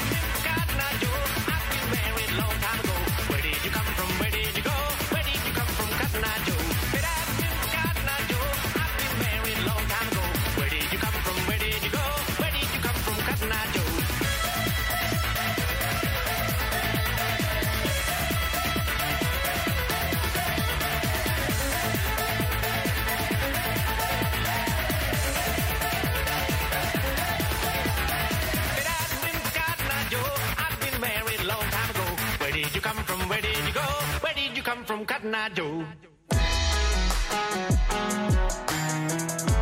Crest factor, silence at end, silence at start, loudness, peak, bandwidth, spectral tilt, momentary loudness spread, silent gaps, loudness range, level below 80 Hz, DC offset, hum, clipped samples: 16 dB; 0 s; 0 s; -26 LUFS; -10 dBFS; 16.5 kHz; -3.5 dB/octave; 1 LU; none; 1 LU; -34 dBFS; under 0.1%; none; under 0.1%